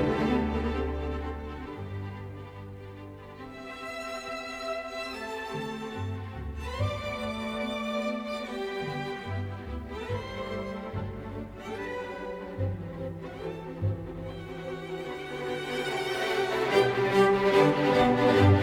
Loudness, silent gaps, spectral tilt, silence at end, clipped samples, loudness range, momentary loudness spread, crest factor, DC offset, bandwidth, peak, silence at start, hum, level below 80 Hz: -30 LUFS; none; -6.5 dB/octave; 0 s; under 0.1%; 11 LU; 16 LU; 20 dB; under 0.1%; 16 kHz; -10 dBFS; 0 s; none; -46 dBFS